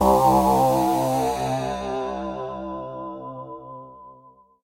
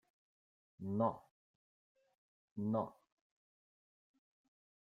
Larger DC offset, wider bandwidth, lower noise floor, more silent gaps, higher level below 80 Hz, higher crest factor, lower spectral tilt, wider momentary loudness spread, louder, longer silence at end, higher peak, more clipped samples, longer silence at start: neither; first, 16 kHz vs 4.1 kHz; second, -52 dBFS vs under -90 dBFS; second, none vs 1.31-1.95 s, 2.15-2.56 s; first, -44 dBFS vs -84 dBFS; second, 16 dB vs 24 dB; second, -6 dB/octave vs -11 dB/octave; first, 21 LU vs 15 LU; first, -22 LUFS vs -40 LUFS; second, 0.5 s vs 1.9 s; first, -8 dBFS vs -22 dBFS; neither; second, 0 s vs 0.8 s